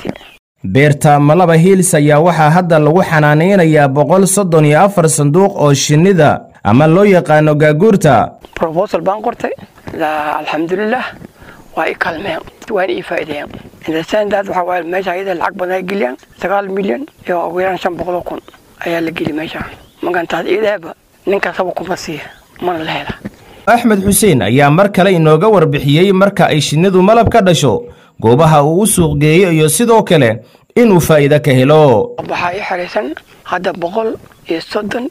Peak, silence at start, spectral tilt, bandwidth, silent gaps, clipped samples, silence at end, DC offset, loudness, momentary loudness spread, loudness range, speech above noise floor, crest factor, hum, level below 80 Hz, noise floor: 0 dBFS; 0 s; -5.5 dB/octave; 16 kHz; 0.39-0.55 s; under 0.1%; 0 s; under 0.1%; -11 LUFS; 13 LU; 9 LU; 26 dB; 12 dB; none; -42 dBFS; -37 dBFS